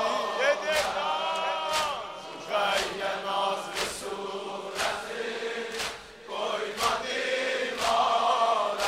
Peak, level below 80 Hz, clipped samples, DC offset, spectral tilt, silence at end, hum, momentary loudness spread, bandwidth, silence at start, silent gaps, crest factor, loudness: -10 dBFS; -62 dBFS; under 0.1%; under 0.1%; -1.5 dB/octave; 0 s; none; 10 LU; 16 kHz; 0 s; none; 18 dB; -28 LUFS